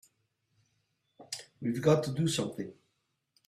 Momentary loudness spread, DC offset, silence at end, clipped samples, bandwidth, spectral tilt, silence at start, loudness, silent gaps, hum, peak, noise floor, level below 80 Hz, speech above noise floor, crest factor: 15 LU; under 0.1%; 0.75 s; under 0.1%; 14 kHz; -5.5 dB/octave; 1.2 s; -31 LUFS; none; none; -12 dBFS; -80 dBFS; -70 dBFS; 50 dB; 24 dB